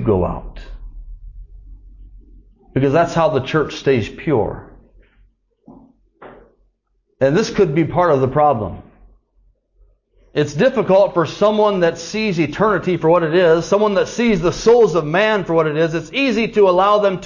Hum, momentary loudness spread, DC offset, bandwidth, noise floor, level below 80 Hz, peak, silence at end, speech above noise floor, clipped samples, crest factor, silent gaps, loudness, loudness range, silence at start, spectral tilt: none; 8 LU; under 0.1%; 7.4 kHz; -65 dBFS; -40 dBFS; -2 dBFS; 0 s; 50 dB; under 0.1%; 14 dB; none; -16 LUFS; 8 LU; 0 s; -6 dB/octave